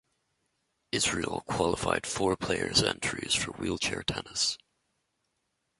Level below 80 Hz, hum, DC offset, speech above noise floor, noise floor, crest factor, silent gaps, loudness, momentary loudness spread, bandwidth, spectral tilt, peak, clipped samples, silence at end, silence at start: -52 dBFS; none; under 0.1%; 49 dB; -79 dBFS; 22 dB; none; -29 LUFS; 7 LU; 12 kHz; -2.5 dB/octave; -10 dBFS; under 0.1%; 1.25 s; 0.95 s